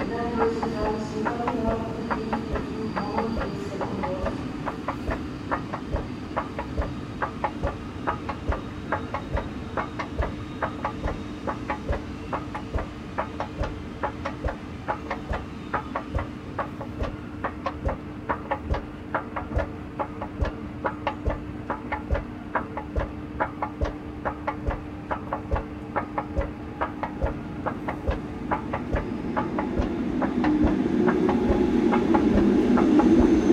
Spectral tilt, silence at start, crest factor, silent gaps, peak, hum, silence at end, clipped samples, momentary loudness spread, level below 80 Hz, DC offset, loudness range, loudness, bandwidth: -7.5 dB/octave; 0 s; 22 dB; none; -6 dBFS; none; 0 s; under 0.1%; 11 LU; -38 dBFS; under 0.1%; 8 LU; -28 LUFS; 11 kHz